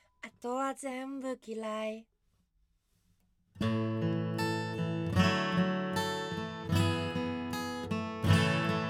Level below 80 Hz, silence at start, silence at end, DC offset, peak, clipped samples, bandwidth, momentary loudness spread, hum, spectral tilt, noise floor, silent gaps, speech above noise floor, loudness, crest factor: -64 dBFS; 0.25 s; 0 s; under 0.1%; -12 dBFS; under 0.1%; 16.5 kHz; 11 LU; none; -6 dB/octave; -74 dBFS; none; 37 dB; -33 LUFS; 20 dB